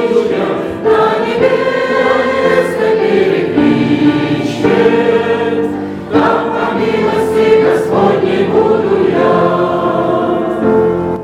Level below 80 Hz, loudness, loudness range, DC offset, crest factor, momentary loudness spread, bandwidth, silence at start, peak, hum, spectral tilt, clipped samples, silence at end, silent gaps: -46 dBFS; -12 LUFS; 1 LU; under 0.1%; 10 dB; 5 LU; 12 kHz; 0 s; 0 dBFS; none; -7 dB/octave; under 0.1%; 0 s; none